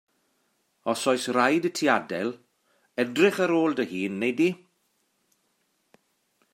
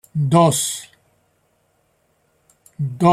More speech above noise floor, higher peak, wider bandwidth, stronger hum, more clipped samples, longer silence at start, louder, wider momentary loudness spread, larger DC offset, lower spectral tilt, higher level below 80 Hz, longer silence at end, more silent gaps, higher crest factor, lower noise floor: about the same, 48 dB vs 48 dB; second, -6 dBFS vs -2 dBFS; about the same, 16 kHz vs 15 kHz; neither; neither; first, 0.85 s vs 0.15 s; second, -25 LUFS vs -18 LUFS; second, 11 LU vs 14 LU; neither; about the same, -4.5 dB/octave vs -5.5 dB/octave; second, -78 dBFS vs -58 dBFS; first, 2 s vs 0 s; neither; about the same, 22 dB vs 18 dB; first, -72 dBFS vs -64 dBFS